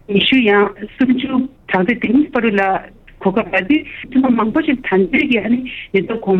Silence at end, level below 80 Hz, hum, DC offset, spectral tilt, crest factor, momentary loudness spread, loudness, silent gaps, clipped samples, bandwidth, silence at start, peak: 0 s; -46 dBFS; none; under 0.1%; -8 dB/octave; 14 dB; 7 LU; -16 LUFS; none; under 0.1%; 4.9 kHz; 0.1 s; -2 dBFS